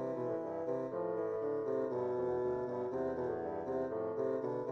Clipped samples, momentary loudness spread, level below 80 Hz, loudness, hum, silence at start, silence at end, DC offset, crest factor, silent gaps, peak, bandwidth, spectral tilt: under 0.1%; 3 LU; -70 dBFS; -38 LUFS; none; 0 s; 0 s; under 0.1%; 12 dB; none; -24 dBFS; 6.6 kHz; -9 dB/octave